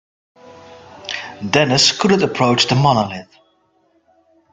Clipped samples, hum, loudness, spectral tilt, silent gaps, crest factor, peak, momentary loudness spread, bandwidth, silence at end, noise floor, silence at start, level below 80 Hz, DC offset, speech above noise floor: under 0.1%; none; -15 LUFS; -4 dB/octave; none; 18 dB; 0 dBFS; 15 LU; 9.4 kHz; 1.3 s; -60 dBFS; 0.7 s; -54 dBFS; under 0.1%; 45 dB